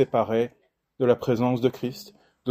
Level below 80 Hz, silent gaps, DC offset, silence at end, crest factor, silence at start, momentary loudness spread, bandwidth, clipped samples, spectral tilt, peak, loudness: -64 dBFS; none; under 0.1%; 0 s; 18 dB; 0 s; 11 LU; 15.5 kHz; under 0.1%; -7.5 dB/octave; -6 dBFS; -25 LUFS